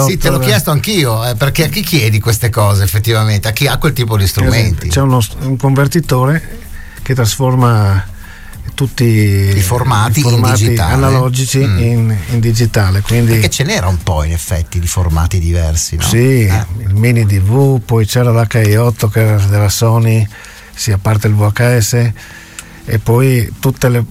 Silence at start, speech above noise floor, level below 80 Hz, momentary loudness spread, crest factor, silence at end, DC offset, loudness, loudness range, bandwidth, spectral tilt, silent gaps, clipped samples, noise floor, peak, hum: 0 s; 21 dB; -26 dBFS; 7 LU; 10 dB; 0 s; under 0.1%; -12 LUFS; 2 LU; 16.5 kHz; -5.5 dB/octave; none; under 0.1%; -32 dBFS; 0 dBFS; none